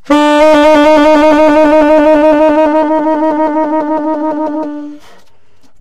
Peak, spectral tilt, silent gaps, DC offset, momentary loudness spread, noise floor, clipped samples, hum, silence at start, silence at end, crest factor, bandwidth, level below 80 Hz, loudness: 0 dBFS; -4.5 dB/octave; none; under 0.1%; 10 LU; -51 dBFS; under 0.1%; none; 0 s; 0.05 s; 8 dB; 11 kHz; -38 dBFS; -8 LUFS